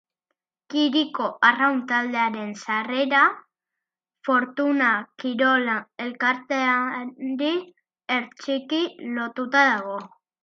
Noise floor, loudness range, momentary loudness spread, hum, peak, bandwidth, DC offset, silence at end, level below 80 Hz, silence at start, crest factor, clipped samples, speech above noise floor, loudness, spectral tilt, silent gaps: -86 dBFS; 4 LU; 11 LU; none; -2 dBFS; 7.6 kHz; under 0.1%; 0.35 s; -80 dBFS; 0.7 s; 22 dB; under 0.1%; 63 dB; -23 LUFS; -4 dB/octave; none